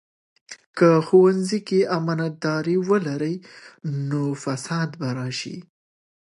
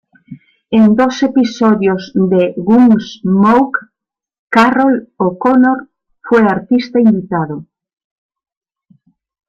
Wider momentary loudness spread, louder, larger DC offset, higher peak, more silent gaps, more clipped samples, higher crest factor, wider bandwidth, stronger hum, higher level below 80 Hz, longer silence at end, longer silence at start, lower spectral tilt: first, 18 LU vs 8 LU; second, -22 LUFS vs -12 LUFS; neither; second, -4 dBFS vs 0 dBFS; about the same, 0.66-0.74 s vs 4.39-4.48 s; neither; first, 20 dB vs 12 dB; first, 11.5 kHz vs 7.4 kHz; neither; second, -72 dBFS vs -52 dBFS; second, 0.6 s vs 1.85 s; first, 0.5 s vs 0.3 s; about the same, -6.5 dB/octave vs -7 dB/octave